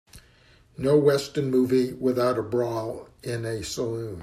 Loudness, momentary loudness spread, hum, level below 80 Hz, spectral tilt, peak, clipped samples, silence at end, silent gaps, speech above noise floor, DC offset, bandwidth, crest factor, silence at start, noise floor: -25 LUFS; 11 LU; none; -56 dBFS; -6 dB/octave; -8 dBFS; under 0.1%; 0 s; none; 32 dB; under 0.1%; 15 kHz; 18 dB; 0.15 s; -57 dBFS